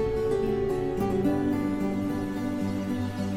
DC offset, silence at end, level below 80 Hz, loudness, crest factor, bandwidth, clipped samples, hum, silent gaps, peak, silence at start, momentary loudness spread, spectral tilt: under 0.1%; 0 s; -44 dBFS; -28 LUFS; 12 dB; 16 kHz; under 0.1%; none; none; -16 dBFS; 0 s; 4 LU; -7.5 dB/octave